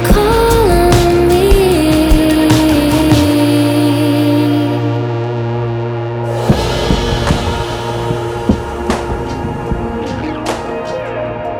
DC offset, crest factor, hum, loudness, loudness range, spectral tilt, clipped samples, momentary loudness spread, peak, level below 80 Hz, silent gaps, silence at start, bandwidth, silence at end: under 0.1%; 12 dB; none; -13 LUFS; 8 LU; -6 dB/octave; under 0.1%; 10 LU; 0 dBFS; -22 dBFS; none; 0 s; over 20 kHz; 0 s